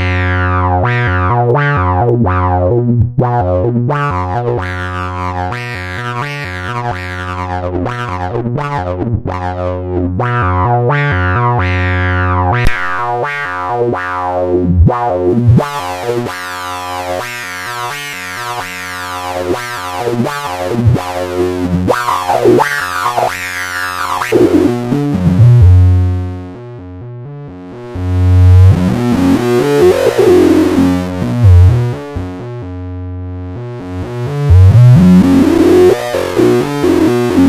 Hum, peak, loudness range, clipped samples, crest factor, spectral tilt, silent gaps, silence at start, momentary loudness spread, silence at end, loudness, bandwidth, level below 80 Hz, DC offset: none; 0 dBFS; 9 LU; 0.4%; 12 dB; -7 dB/octave; none; 0 s; 14 LU; 0 s; -12 LUFS; 15 kHz; -28 dBFS; under 0.1%